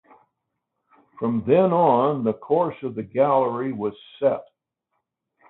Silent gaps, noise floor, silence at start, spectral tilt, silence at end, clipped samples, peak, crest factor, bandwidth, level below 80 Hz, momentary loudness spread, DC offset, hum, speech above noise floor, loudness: none; -79 dBFS; 1.2 s; -12 dB/octave; 1.1 s; under 0.1%; -4 dBFS; 18 dB; 4.1 kHz; -64 dBFS; 12 LU; under 0.1%; none; 58 dB; -22 LUFS